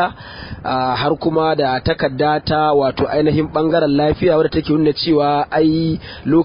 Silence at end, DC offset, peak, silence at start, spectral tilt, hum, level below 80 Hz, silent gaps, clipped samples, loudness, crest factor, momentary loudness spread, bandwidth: 0 s; under 0.1%; -4 dBFS; 0 s; -11.5 dB/octave; none; -38 dBFS; none; under 0.1%; -16 LUFS; 12 dB; 7 LU; 5.4 kHz